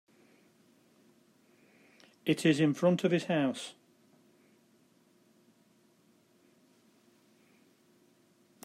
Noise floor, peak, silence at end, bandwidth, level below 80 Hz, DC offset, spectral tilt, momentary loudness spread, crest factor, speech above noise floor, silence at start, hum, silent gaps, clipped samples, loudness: -67 dBFS; -14 dBFS; 4.95 s; 14.5 kHz; -82 dBFS; under 0.1%; -6 dB/octave; 12 LU; 22 dB; 39 dB; 2.25 s; none; none; under 0.1%; -30 LUFS